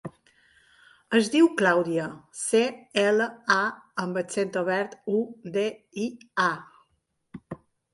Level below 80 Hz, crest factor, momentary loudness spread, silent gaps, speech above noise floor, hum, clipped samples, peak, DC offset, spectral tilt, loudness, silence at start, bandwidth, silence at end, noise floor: -70 dBFS; 20 dB; 14 LU; none; 48 dB; none; under 0.1%; -6 dBFS; under 0.1%; -4 dB/octave; -26 LUFS; 0.05 s; 11.5 kHz; 0.4 s; -74 dBFS